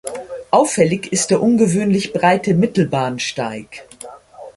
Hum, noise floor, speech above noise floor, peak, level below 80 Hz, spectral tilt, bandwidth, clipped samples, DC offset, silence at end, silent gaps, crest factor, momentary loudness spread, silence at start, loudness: none; -38 dBFS; 22 dB; -2 dBFS; -54 dBFS; -5 dB/octave; 11.5 kHz; under 0.1%; under 0.1%; 0.05 s; none; 16 dB; 20 LU; 0.05 s; -16 LUFS